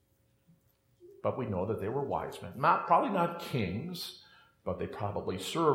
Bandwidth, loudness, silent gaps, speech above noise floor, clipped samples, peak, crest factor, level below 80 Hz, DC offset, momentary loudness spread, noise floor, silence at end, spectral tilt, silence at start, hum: 16.5 kHz; -33 LUFS; none; 38 dB; under 0.1%; -12 dBFS; 20 dB; -68 dBFS; under 0.1%; 13 LU; -70 dBFS; 0 s; -6 dB/octave; 1 s; none